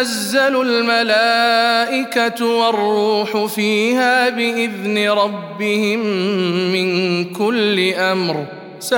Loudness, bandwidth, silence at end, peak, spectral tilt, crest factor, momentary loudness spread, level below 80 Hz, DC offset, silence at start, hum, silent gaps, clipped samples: -16 LUFS; 18 kHz; 0 s; -2 dBFS; -4 dB/octave; 14 dB; 6 LU; -72 dBFS; under 0.1%; 0 s; none; none; under 0.1%